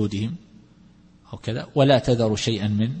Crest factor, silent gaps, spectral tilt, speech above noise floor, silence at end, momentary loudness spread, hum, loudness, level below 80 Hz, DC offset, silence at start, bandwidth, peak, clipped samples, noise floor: 18 dB; none; -6 dB/octave; 31 dB; 0 s; 16 LU; none; -22 LUFS; -50 dBFS; under 0.1%; 0 s; 8.8 kHz; -6 dBFS; under 0.1%; -52 dBFS